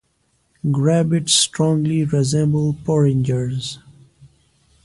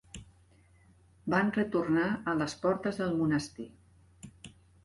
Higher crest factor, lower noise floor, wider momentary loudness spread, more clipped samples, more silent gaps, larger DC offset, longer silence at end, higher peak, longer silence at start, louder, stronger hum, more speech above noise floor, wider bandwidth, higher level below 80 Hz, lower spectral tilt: about the same, 16 dB vs 18 dB; about the same, -64 dBFS vs -62 dBFS; second, 11 LU vs 21 LU; neither; neither; neither; first, 0.6 s vs 0.35 s; first, -2 dBFS vs -16 dBFS; first, 0.65 s vs 0.15 s; first, -18 LUFS vs -31 LUFS; neither; first, 47 dB vs 32 dB; about the same, 11.5 kHz vs 11.5 kHz; first, -52 dBFS vs -62 dBFS; about the same, -5 dB/octave vs -6 dB/octave